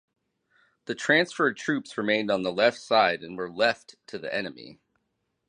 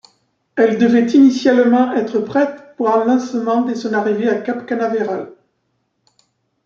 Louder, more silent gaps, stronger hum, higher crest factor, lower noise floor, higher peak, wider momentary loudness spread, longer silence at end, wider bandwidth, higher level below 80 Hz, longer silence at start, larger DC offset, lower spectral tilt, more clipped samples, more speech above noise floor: second, -25 LUFS vs -16 LUFS; neither; neither; first, 22 dB vs 14 dB; first, -78 dBFS vs -68 dBFS; second, -6 dBFS vs -2 dBFS; first, 15 LU vs 10 LU; second, 0.75 s vs 1.35 s; first, 10.5 kHz vs 7.2 kHz; second, -72 dBFS vs -64 dBFS; first, 0.9 s vs 0.55 s; neither; second, -4 dB/octave vs -6 dB/octave; neither; about the same, 51 dB vs 53 dB